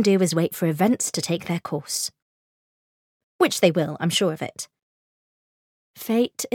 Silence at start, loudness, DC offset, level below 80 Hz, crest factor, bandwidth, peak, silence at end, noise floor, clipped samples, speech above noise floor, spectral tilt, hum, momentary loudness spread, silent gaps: 0 s; -23 LUFS; under 0.1%; -70 dBFS; 20 dB; 18.5 kHz; -4 dBFS; 0.05 s; under -90 dBFS; under 0.1%; over 68 dB; -4.5 dB/octave; none; 12 LU; 2.22-3.39 s, 4.82-5.94 s